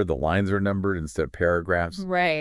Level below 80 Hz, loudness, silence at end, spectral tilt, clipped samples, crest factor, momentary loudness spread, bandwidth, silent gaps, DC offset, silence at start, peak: -44 dBFS; -25 LUFS; 0 s; -6.5 dB/octave; under 0.1%; 16 dB; 4 LU; 12 kHz; none; under 0.1%; 0 s; -8 dBFS